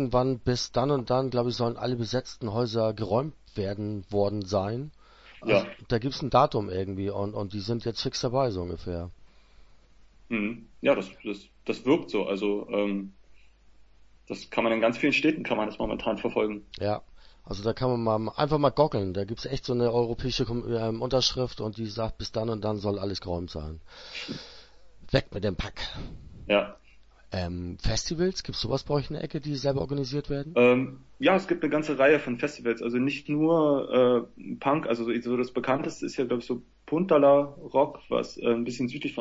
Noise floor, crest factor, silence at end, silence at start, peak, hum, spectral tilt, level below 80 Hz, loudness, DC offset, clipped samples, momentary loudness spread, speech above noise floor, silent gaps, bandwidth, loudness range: -55 dBFS; 20 dB; 0 s; 0 s; -8 dBFS; none; -6 dB/octave; -48 dBFS; -28 LUFS; under 0.1%; under 0.1%; 12 LU; 28 dB; none; 8 kHz; 7 LU